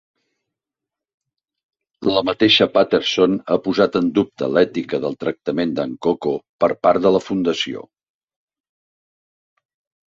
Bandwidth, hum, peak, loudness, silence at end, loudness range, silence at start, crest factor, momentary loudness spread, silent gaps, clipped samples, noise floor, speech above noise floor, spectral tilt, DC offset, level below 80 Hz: 7.6 kHz; none; -2 dBFS; -18 LUFS; 2.25 s; 4 LU; 2 s; 18 dB; 9 LU; 6.49-6.59 s; under 0.1%; -86 dBFS; 68 dB; -5.5 dB/octave; under 0.1%; -58 dBFS